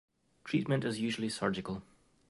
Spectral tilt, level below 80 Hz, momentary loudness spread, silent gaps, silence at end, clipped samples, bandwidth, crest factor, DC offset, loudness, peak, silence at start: -5.5 dB/octave; -66 dBFS; 11 LU; none; 0.45 s; under 0.1%; 11.5 kHz; 18 dB; under 0.1%; -35 LUFS; -18 dBFS; 0.45 s